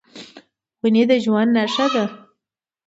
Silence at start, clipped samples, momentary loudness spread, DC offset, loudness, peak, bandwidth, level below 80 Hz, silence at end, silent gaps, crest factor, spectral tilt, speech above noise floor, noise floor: 0.15 s; under 0.1%; 15 LU; under 0.1%; -18 LUFS; -6 dBFS; 8 kHz; -70 dBFS; 0.7 s; none; 14 dB; -5.5 dB/octave; 68 dB; -85 dBFS